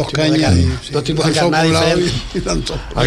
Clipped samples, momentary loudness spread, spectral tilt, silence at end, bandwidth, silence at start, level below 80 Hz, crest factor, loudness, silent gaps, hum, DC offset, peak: under 0.1%; 8 LU; -5 dB/octave; 0 s; 13 kHz; 0 s; -28 dBFS; 14 dB; -15 LUFS; none; none; under 0.1%; -2 dBFS